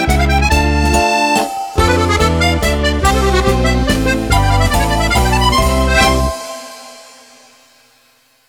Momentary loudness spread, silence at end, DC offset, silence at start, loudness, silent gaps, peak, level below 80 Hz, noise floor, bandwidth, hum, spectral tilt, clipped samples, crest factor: 5 LU; 1.45 s; under 0.1%; 0 s; -13 LUFS; none; 0 dBFS; -18 dBFS; -53 dBFS; 18.5 kHz; none; -4.5 dB/octave; under 0.1%; 14 dB